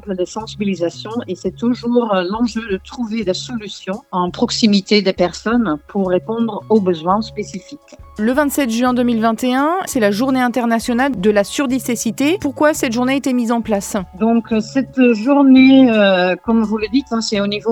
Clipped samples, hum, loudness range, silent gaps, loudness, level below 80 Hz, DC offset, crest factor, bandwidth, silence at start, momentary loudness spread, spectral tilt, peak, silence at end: under 0.1%; none; 7 LU; none; -16 LUFS; -46 dBFS; under 0.1%; 16 dB; 16.5 kHz; 0.05 s; 11 LU; -5 dB/octave; 0 dBFS; 0 s